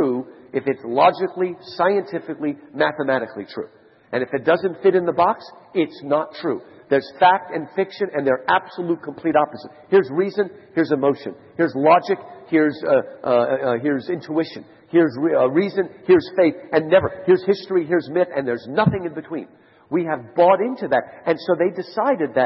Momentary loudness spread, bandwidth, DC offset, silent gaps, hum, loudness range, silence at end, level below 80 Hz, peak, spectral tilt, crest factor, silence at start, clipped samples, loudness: 11 LU; 6 kHz; under 0.1%; none; none; 3 LU; 0 s; -64 dBFS; -2 dBFS; -9 dB/octave; 18 dB; 0 s; under 0.1%; -20 LUFS